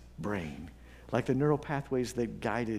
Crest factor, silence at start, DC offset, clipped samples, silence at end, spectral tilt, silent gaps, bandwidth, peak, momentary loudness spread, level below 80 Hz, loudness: 20 dB; 0 s; under 0.1%; under 0.1%; 0 s; -7 dB/octave; none; 15.5 kHz; -14 dBFS; 17 LU; -54 dBFS; -33 LUFS